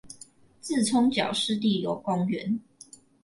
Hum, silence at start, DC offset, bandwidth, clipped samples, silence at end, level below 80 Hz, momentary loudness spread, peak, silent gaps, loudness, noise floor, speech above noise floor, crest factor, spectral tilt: none; 0.05 s; under 0.1%; 11.5 kHz; under 0.1%; 0.65 s; -68 dBFS; 16 LU; -12 dBFS; none; -26 LUFS; -53 dBFS; 27 dB; 16 dB; -4.5 dB/octave